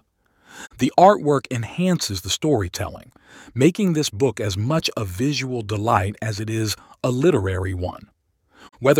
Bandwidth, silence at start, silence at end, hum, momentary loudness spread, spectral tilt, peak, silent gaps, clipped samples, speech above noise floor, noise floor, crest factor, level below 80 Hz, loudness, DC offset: 17 kHz; 0.55 s; 0 s; none; 11 LU; -5.5 dB/octave; 0 dBFS; none; under 0.1%; 38 dB; -59 dBFS; 20 dB; -50 dBFS; -21 LUFS; under 0.1%